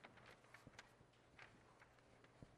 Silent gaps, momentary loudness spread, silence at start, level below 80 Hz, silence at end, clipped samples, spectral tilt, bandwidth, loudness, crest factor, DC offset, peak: none; 6 LU; 0 s; -80 dBFS; 0 s; under 0.1%; -4 dB/octave; 13 kHz; -66 LUFS; 24 dB; under 0.1%; -42 dBFS